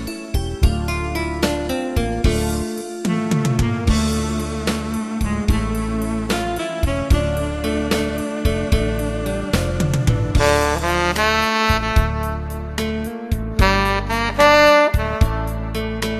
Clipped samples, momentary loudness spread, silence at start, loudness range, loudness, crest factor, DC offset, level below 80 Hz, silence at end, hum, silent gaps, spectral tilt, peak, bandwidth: under 0.1%; 9 LU; 0 s; 5 LU; -19 LUFS; 18 dB; under 0.1%; -26 dBFS; 0 s; none; none; -5.5 dB/octave; 0 dBFS; 14.5 kHz